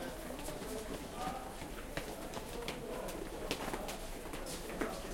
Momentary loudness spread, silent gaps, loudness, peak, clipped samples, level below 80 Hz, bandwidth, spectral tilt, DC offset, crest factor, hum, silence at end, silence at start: 4 LU; none; -43 LUFS; -16 dBFS; under 0.1%; -50 dBFS; 16.5 kHz; -4 dB/octave; under 0.1%; 26 dB; none; 0 s; 0 s